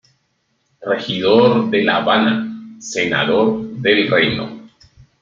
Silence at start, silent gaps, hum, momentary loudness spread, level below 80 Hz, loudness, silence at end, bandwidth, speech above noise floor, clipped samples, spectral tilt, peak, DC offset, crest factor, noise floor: 0.8 s; none; none; 13 LU; -54 dBFS; -16 LUFS; 0.55 s; 7.6 kHz; 51 dB; under 0.1%; -5 dB/octave; 0 dBFS; under 0.1%; 16 dB; -66 dBFS